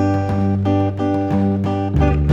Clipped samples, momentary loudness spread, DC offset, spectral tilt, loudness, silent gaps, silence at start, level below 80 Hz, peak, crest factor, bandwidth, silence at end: under 0.1%; 2 LU; under 0.1%; -9.5 dB/octave; -18 LUFS; none; 0 s; -26 dBFS; -2 dBFS; 14 dB; 7 kHz; 0 s